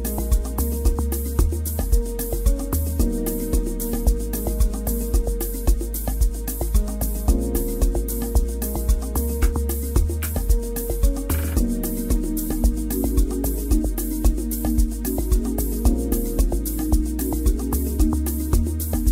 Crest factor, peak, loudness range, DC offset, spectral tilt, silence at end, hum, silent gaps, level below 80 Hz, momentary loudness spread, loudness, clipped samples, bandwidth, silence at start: 16 dB; -4 dBFS; 1 LU; under 0.1%; -6 dB/octave; 0 s; none; none; -22 dBFS; 3 LU; -24 LUFS; under 0.1%; 16.5 kHz; 0 s